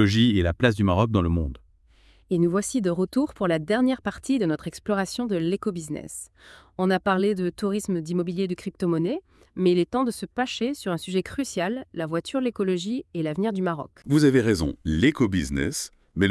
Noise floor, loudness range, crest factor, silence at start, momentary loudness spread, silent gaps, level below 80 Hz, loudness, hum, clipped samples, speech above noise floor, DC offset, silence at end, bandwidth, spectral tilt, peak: -57 dBFS; 4 LU; 20 dB; 0 s; 9 LU; none; -46 dBFS; -25 LUFS; none; under 0.1%; 33 dB; under 0.1%; 0 s; 12 kHz; -6 dB/octave; -4 dBFS